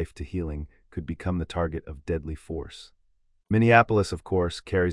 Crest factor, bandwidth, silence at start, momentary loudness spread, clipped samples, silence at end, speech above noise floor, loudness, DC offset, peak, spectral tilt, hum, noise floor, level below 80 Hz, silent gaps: 24 dB; 11.5 kHz; 0 s; 19 LU; under 0.1%; 0 s; 40 dB; -26 LUFS; under 0.1%; -2 dBFS; -7 dB/octave; none; -66 dBFS; -44 dBFS; none